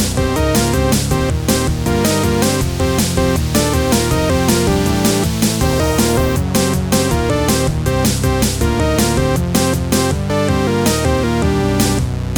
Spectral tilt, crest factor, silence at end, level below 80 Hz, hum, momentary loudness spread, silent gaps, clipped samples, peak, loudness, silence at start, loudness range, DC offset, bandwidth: -5 dB/octave; 14 dB; 0 s; -24 dBFS; none; 2 LU; none; under 0.1%; 0 dBFS; -15 LUFS; 0 s; 1 LU; under 0.1%; 19.5 kHz